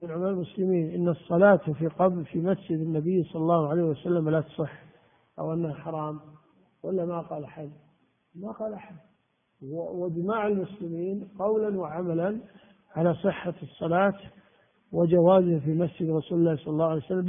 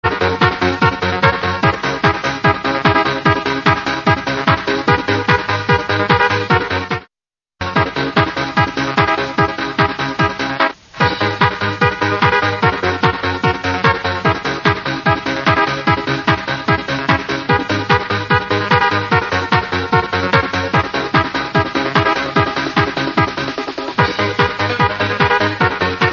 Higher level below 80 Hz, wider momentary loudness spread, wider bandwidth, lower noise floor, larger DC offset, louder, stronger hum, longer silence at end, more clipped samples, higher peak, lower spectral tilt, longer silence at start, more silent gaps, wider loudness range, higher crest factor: second, -64 dBFS vs -40 dBFS; first, 15 LU vs 3 LU; second, 3.7 kHz vs 7.2 kHz; second, -71 dBFS vs under -90 dBFS; neither; second, -27 LUFS vs -15 LUFS; neither; about the same, 0 s vs 0 s; neither; second, -8 dBFS vs 0 dBFS; first, -12.5 dB/octave vs -5.5 dB/octave; about the same, 0 s vs 0 s; neither; first, 11 LU vs 2 LU; about the same, 20 dB vs 16 dB